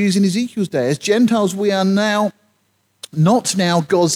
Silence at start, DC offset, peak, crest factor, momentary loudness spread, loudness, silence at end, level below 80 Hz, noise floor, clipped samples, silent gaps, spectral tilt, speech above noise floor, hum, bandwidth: 0 s; under 0.1%; -4 dBFS; 14 dB; 5 LU; -17 LUFS; 0 s; -64 dBFS; -63 dBFS; under 0.1%; none; -5 dB/octave; 48 dB; none; 15.5 kHz